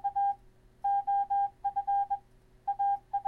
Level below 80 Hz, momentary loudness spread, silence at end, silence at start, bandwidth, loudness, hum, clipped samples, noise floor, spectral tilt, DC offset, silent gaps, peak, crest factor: -62 dBFS; 9 LU; 0 s; 0.05 s; 3.4 kHz; -32 LUFS; none; under 0.1%; -58 dBFS; -5 dB/octave; under 0.1%; none; -24 dBFS; 8 dB